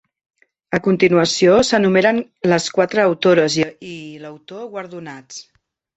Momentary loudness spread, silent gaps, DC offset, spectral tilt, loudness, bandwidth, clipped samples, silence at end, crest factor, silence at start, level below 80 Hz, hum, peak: 21 LU; none; under 0.1%; -4.5 dB/octave; -16 LUFS; 8.2 kHz; under 0.1%; 0.55 s; 16 dB; 0.7 s; -54 dBFS; none; -2 dBFS